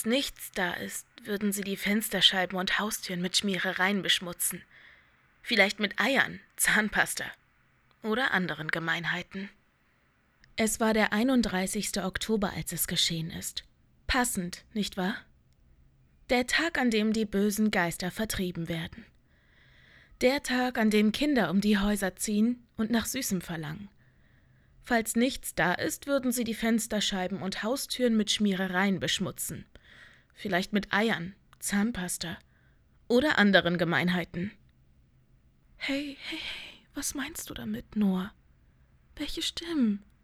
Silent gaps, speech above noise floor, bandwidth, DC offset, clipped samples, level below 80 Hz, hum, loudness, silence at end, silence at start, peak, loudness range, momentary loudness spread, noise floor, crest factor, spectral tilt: none; 39 dB; 16.5 kHz; under 0.1%; under 0.1%; -54 dBFS; none; -28 LUFS; 0.25 s; 0 s; -6 dBFS; 5 LU; 12 LU; -68 dBFS; 24 dB; -3.5 dB/octave